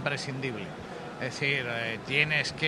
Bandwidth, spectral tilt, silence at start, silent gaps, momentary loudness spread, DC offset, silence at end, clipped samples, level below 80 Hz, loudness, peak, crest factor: 13 kHz; -4 dB/octave; 0 s; none; 14 LU; under 0.1%; 0 s; under 0.1%; -60 dBFS; -29 LUFS; -8 dBFS; 22 dB